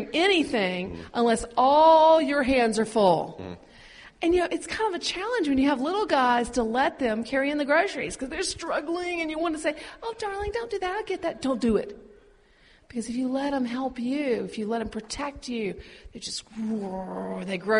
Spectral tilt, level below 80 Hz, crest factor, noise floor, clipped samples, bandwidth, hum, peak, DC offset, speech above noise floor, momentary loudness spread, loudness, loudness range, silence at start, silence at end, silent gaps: -4 dB/octave; -50 dBFS; 18 dB; -58 dBFS; under 0.1%; 10.5 kHz; none; -8 dBFS; under 0.1%; 32 dB; 12 LU; -25 LUFS; 9 LU; 0 s; 0 s; none